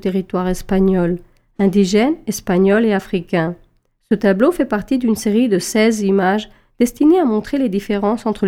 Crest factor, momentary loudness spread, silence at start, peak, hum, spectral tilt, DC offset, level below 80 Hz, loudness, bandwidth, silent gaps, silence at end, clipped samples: 16 dB; 7 LU; 0.05 s; -2 dBFS; none; -6 dB/octave; under 0.1%; -40 dBFS; -16 LUFS; 16 kHz; none; 0 s; under 0.1%